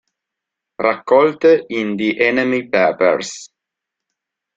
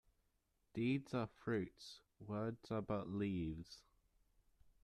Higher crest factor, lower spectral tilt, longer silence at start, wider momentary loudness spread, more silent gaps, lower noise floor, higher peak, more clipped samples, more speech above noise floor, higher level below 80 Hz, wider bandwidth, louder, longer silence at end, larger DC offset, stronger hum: about the same, 16 dB vs 18 dB; second, -4.5 dB/octave vs -7.5 dB/octave; about the same, 0.8 s vs 0.75 s; second, 9 LU vs 16 LU; neither; about the same, -82 dBFS vs -82 dBFS; first, -2 dBFS vs -28 dBFS; neither; first, 67 dB vs 39 dB; first, -62 dBFS vs -68 dBFS; second, 7.8 kHz vs 12.5 kHz; first, -16 LUFS vs -44 LUFS; first, 1.1 s vs 0.15 s; neither; neither